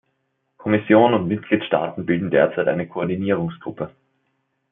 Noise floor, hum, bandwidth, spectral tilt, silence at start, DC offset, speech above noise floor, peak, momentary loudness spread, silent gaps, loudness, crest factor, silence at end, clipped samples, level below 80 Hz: -72 dBFS; none; 3.8 kHz; -11.5 dB/octave; 0.6 s; under 0.1%; 52 dB; -2 dBFS; 16 LU; none; -20 LUFS; 18 dB; 0.8 s; under 0.1%; -62 dBFS